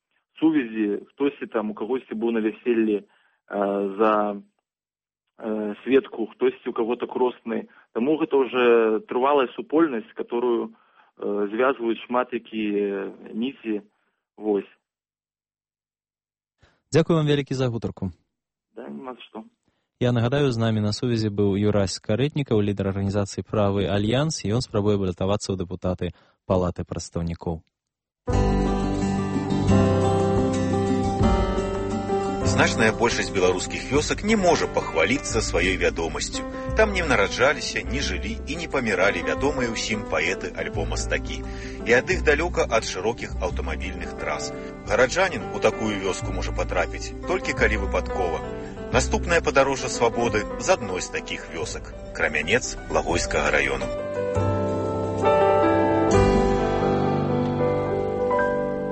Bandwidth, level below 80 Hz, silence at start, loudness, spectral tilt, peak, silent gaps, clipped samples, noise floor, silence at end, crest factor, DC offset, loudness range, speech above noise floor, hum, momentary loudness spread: 8.8 kHz; -36 dBFS; 0.35 s; -24 LUFS; -5.5 dB/octave; -6 dBFS; none; under 0.1%; under -90 dBFS; 0 s; 18 dB; under 0.1%; 5 LU; over 66 dB; none; 11 LU